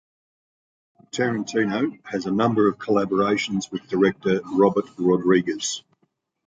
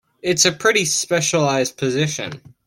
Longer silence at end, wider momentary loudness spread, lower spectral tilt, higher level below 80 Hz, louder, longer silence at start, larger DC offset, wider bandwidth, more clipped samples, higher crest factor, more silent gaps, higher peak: first, 0.65 s vs 0.25 s; about the same, 8 LU vs 8 LU; first, -5 dB/octave vs -3 dB/octave; about the same, -62 dBFS vs -58 dBFS; second, -22 LUFS vs -18 LUFS; first, 1.15 s vs 0.25 s; neither; second, 9.2 kHz vs 16.5 kHz; neither; about the same, 18 dB vs 18 dB; neither; second, -6 dBFS vs -2 dBFS